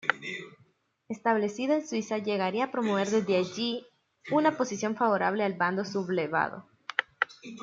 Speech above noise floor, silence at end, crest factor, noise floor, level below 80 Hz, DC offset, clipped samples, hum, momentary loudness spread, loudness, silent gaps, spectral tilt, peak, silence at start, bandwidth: 38 dB; 0 s; 24 dB; -66 dBFS; -76 dBFS; under 0.1%; under 0.1%; none; 11 LU; -29 LUFS; none; -5 dB/octave; -4 dBFS; 0.05 s; 7.8 kHz